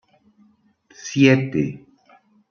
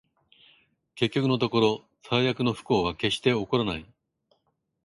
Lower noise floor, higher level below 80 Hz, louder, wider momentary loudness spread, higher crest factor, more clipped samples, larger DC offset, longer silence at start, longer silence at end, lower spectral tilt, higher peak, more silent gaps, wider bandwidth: second, -58 dBFS vs -74 dBFS; about the same, -60 dBFS vs -56 dBFS; first, -19 LUFS vs -26 LUFS; first, 21 LU vs 6 LU; about the same, 20 dB vs 20 dB; neither; neither; about the same, 1.05 s vs 0.95 s; second, 0.75 s vs 1 s; about the same, -6 dB/octave vs -6 dB/octave; first, -2 dBFS vs -8 dBFS; neither; second, 7.2 kHz vs 11.5 kHz